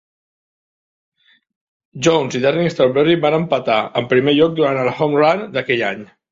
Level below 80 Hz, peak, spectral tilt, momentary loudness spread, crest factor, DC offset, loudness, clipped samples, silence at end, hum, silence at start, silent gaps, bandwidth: -58 dBFS; -2 dBFS; -5.5 dB/octave; 5 LU; 16 dB; under 0.1%; -16 LUFS; under 0.1%; 0.25 s; none; 1.95 s; none; 7.8 kHz